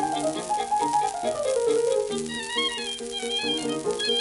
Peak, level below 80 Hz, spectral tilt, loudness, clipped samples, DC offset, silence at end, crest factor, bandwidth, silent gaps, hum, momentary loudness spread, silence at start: -12 dBFS; -60 dBFS; -2 dB/octave; -26 LUFS; under 0.1%; under 0.1%; 0 s; 14 dB; 12 kHz; none; none; 6 LU; 0 s